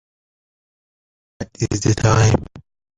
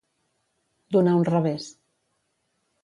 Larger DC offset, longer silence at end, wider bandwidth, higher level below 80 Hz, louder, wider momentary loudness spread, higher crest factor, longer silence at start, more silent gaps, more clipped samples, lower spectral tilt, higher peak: neither; second, 0.4 s vs 1.15 s; second, 9.4 kHz vs 10.5 kHz; first, -38 dBFS vs -72 dBFS; first, -17 LUFS vs -22 LUFS; first, 18 LU vs 14 LU; about the same, 20 dB vs 18 dB; first, 1.4 s vs 0.9 s; neither; neither; second, -5.5 dB/octave vs -8 dB/octave; first, -2 dBFS vs -10 dBFS